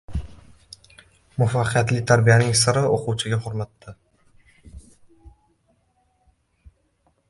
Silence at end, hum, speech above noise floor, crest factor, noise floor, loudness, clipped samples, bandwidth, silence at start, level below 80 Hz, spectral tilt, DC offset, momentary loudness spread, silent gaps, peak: 2 s; none; 46 dB; 22 dB; -66 dBFS; -20 LUFS; under 0.1%; 11.5 kHz; 0.1 s; -44 dBFS; -4.5 dB/octave; under 0.1%; 18 LU; none; -2 dBFS